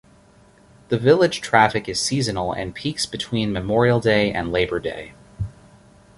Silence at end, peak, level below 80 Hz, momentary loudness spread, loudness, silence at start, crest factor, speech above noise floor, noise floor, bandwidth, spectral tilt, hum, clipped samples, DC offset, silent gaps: 0.65 s; -2 dBFS; -46 dBFS; 16 LU; -20 LUFS; 0.9 s; 20 dB; 32 dB; -52 dBFS; 11.5 kHz; -5 dB/octave; none; under 0.1%; under 0.1%; none